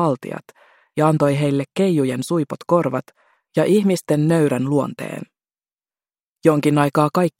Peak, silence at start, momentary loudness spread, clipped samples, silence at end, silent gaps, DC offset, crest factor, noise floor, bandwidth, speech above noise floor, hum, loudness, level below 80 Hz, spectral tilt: -2 dBFS; 0 s; 12 LU; under 0.1%; 0.1 s; 5.73-5.77 s, 6.27-6.36 s; under 0.1%; 18 dB; under -90 dBFS; 16.5 kHz; over 72 dB; none; -19 LUFS; -62 dBFS; -7 dB/octave